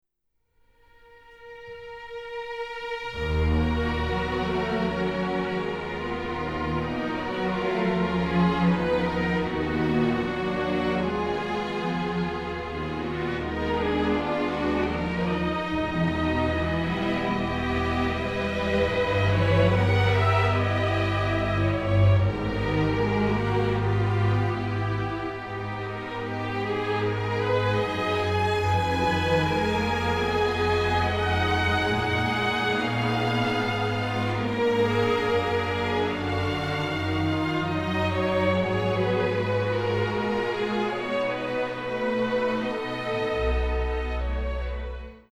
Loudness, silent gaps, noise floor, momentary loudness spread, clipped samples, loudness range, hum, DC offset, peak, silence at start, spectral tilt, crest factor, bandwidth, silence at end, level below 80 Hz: -26 LUFS; none; -74 dBFS; 7 LU; under 0.1%; 5 LU; none; under 0.1%; -10 dBFS; 1.3 s; -7 dB/octave; 16 dB; 11.5 kHz; 0.1 s; -38 dBFS